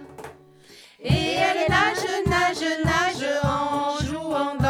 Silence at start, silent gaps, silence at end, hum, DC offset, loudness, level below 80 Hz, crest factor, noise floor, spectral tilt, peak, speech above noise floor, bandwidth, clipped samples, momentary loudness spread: 0 s; none; 0 s; none; under 0.1%; -23 LUFS; -44 dBFS; 20 dB; -49 dBFS; -5 dB/octave; -4 dBFS; 27 dB; 16.5 kHz; under 0.1%; 9 LU